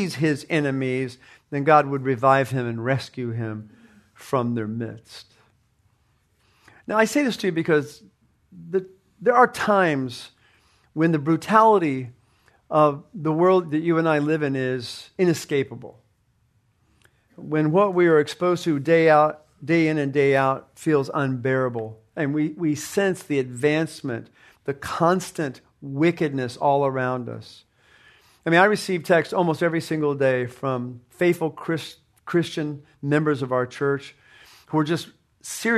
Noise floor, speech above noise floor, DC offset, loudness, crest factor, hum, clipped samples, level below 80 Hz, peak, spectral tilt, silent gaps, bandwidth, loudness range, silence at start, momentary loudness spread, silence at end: -65 dBFS; 43 dB; under 0.1%; -22 LUFS; 22 dB; none; under 0.1%; -66 dBFS; -2 dBFS; -6 dB/octave; none; 13.5 kHz; 6 LU; 0 s; 15 LU; 0 s